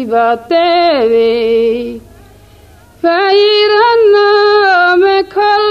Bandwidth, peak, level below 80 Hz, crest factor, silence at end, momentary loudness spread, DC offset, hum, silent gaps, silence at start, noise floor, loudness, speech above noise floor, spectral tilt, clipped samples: 7 kHz; 0 dBFS; -46 dBFS; 10 dB; 0 s; 6 LU; 0.1%; none; none; 0 s; -40 dBFS; -9 LUFS; 31 dB; -4.5 dB/octave; under 0.1%